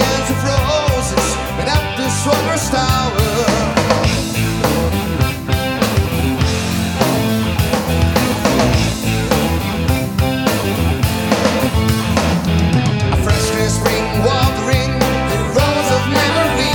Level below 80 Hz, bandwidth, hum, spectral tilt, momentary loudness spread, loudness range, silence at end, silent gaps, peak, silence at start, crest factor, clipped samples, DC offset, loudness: -26 dBFS; 19 kHz; none; -5 dB/octave; 3 LU; 1 LU; 0 s; none; 0 dBFS; 0 s; 14 dB; under 0.1%; under 0.1%; -15 LUFS